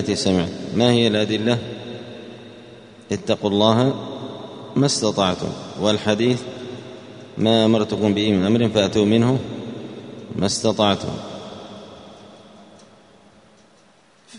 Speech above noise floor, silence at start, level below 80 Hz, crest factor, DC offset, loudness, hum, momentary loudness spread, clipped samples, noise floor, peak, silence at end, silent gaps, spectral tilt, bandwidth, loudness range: 35 dB; 0 s; -54 dBFS; 22 dB; under 0.1%; -20 LUFS; none; 20 LU; under 0.1%; -54 dBFS; 0 dBFS; 0 s; none; -5.5 dB/octave; 10.5 kHz; 6 LU